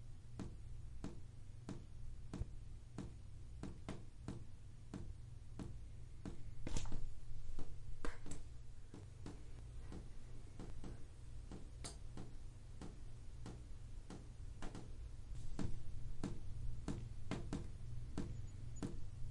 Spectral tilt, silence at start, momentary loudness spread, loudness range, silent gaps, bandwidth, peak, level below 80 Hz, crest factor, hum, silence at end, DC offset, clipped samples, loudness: -6 dB/octave; 0 s; 8 LU; 6 LU; none; 11 kHz; -26 dBFS; -50 dBFS; 18 dB; none; 0 s; under 0.1%; under 0.1%; -53 LUFS